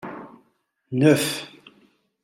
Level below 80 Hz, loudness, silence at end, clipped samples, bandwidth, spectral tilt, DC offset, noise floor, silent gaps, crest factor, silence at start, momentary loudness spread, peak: -70 dBFS; -21 LUFS; 0.75 s; under 0.1%; 16 kHz; -5 dB/octave; under 0.1%; -68 dBFS; none; 20 dB; 0.05 s; 23 LU; -4 dBFS